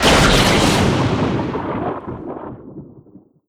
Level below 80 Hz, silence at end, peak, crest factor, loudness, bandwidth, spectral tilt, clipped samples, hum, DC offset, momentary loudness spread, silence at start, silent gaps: -30 dBFS; 0.5 s; 0 dBFS; 18 dB; -16 LUFS; over 20 kHz; -4.5 dB/octave; under 0.1%; none; under 0.1%; 21 LU; 0 s; none